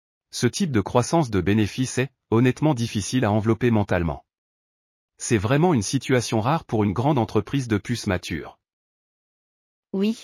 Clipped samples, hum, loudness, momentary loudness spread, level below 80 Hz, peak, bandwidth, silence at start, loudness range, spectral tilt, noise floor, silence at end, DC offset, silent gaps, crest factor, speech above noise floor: under 0.1%; none; -23 LUFS; 7 LU; -48 dBFS; -4 dBFS; 14.5 kHz; 0.35 s; 4 LU; -6 dB/octave; under -90 dBFS; 0 s; under 0.1%; 4.38-5.08 s, 8.73-9.83 s; 18 dB; over 68 dB